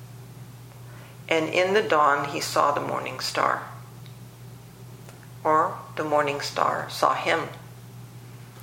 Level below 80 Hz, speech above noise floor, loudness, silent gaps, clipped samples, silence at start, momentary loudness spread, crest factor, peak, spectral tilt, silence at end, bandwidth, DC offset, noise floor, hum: -64 dBFS; 20 dB; -24 LUFS; none; under 0.1%; 0 s; 22 LU; 22 dB; -4 dBFS; -4 dB/octave; 0 s; 16.5 kHz; under 0.1%; -44 dBFS; none